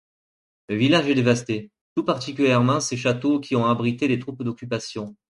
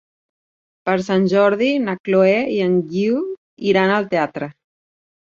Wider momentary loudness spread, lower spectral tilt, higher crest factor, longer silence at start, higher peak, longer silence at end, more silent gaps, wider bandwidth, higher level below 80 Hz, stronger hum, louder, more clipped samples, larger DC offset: about the same, 12 LU vs 10 LU; second, -5.5 dB/octave vs -7 dB/octave; about the same, 20 dB vs 16 dB; second, 0.7 s vs 0.85 s; about the same, -4 dBFS vs -2 dBFS; second, 0.2 s vs 0.9 s; second, 1.81-1.96 s vs 2.00-2.04 s, 3.38-3.57 s; first, 11.5 kHz vs 7.4 kHz; about the same, -60 dBFS vs -62 dBFS; neither; second, -22 LUFS vs -18 LUFS; neither; neither